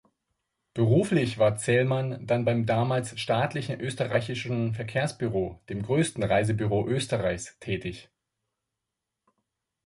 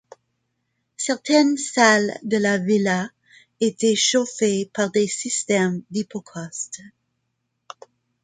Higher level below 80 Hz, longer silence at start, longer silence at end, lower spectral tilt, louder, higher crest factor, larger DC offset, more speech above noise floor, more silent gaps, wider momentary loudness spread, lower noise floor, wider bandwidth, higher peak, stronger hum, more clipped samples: first, -54 dBFS vs -68 dBFS; second, 0.75 s vs 1 s; first, 1.85 s vs 1.35 s; first, -6 dB/octave vs -3.5 dB/octave; second, -27 LUFS vs -21 LUFS; about the same, 18 dB vs 20 dB; neither; first, 59 dB vs 55 dB; neither; second, 9 LU vs 14 LU; first, -86 dBFS vs -75 dBFS; first, 11.5 kHz vs 9.6 kHz; second, -10 dBFS vs -2 dBFS; neither; neither